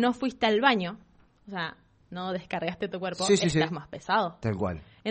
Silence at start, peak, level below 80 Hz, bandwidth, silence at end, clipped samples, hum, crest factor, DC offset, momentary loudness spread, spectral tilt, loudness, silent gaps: 0 s; -6 dBFS; -56 dBFS; 8.4 kHz; 0 s; under 0.1%; none; 22 dB; under 0.1%; 14 LU; -4.5 dB/octave; -28 LUFS; none